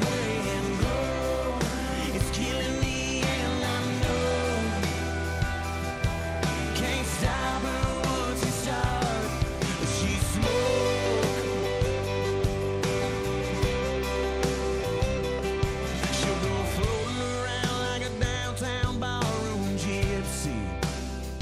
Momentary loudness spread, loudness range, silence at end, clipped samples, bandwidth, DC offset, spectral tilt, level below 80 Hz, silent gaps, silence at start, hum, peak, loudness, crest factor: 3 LU; 2 LU; 0 s; under 0.1%; 16 kHz; under 0.1%; -4.5 dB/octave; -36 dBFS; none; 0 s; none; -14 dBFS; -28 LUFS; 12 dB